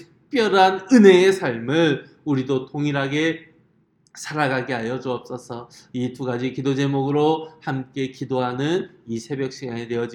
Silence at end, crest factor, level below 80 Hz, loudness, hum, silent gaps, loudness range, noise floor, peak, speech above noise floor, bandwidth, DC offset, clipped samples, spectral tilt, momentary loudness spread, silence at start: 0 s; 20 dB; -66 dBFS; -21 LUFS; none; none; 8 LU; -61 dBFS; 0 dBFS; 41 dB; 12 kHz; under 0.1%; under 0.1%; -6 dB/octave; 15 LU; 0 s